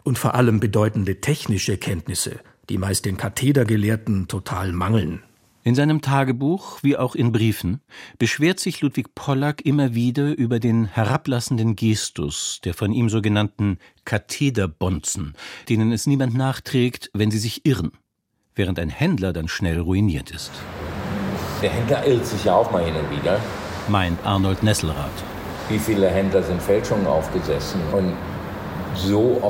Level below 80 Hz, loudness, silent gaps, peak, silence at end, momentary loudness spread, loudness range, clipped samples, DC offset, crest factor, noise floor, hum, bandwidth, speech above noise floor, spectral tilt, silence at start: -42 dBFS; -22 LUFS; none; -2 dBFS; 0 s; 10 LU; 2 LU; under 0.1%; under 0.1%; 20 dB; -72 dBFS; none; 16.5 kHz; 51 dB; -6 dB/octave; 0.05 s